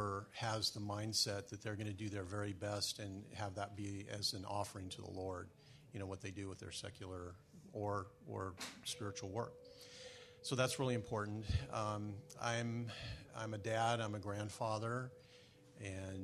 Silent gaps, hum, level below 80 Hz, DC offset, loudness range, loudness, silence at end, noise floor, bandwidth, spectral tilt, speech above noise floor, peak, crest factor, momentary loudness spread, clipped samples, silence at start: none; none; -64 dBFS; under 0.1%; 6 LU; -43 LUFS; 0 s; -64 dBFS; 13.5 kHz; -4.5 dB/octave; 20 dB; -22 dBFS; 22 dB; 14 LU; under 0.1%; 0 s